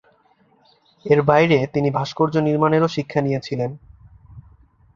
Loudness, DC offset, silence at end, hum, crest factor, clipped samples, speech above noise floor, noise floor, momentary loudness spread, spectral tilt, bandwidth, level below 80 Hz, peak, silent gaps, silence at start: -19 LUFS; under 0.1%; 0.55 s; none; 18 dB; under 0.1%; 40 dB; -58 dBFS; 11 LU; -7.5 dB/octave; 7.4 kHz; -54 dBFS; -2 dBFS; none; 1.05 s